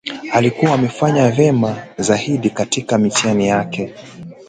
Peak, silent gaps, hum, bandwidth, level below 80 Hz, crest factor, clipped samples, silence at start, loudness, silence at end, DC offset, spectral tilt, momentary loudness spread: 0 dBFS; none; none; 9.4 kHz; -52 dBFS; 16 dB; under 0.1%; 0.05 s; -16 LUFS; 0.05 s; under 0.1%; -5 dB/octave; 10 LU